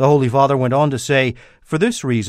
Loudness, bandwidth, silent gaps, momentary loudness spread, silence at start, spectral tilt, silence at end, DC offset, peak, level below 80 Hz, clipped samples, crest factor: -17 LUFS; 14 kHz; none; 6 LU; 0 s; -6 dB/octave; 0 s; under 0.1%; -2 dBFS; -50 dBFS; under 0.1%; 16 dB